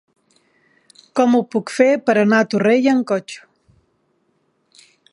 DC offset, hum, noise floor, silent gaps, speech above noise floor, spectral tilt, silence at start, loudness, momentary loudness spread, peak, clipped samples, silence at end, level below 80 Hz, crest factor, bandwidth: under 0.1%; none; -65 dBFS; none; 49 dB; -6 dB/octave; 1.15 s; -16 LUFS; 10 LU; -2 dBFS; under 0.1%; 1.75 s; -70 dBFS; 18 dB; 11.5 kHz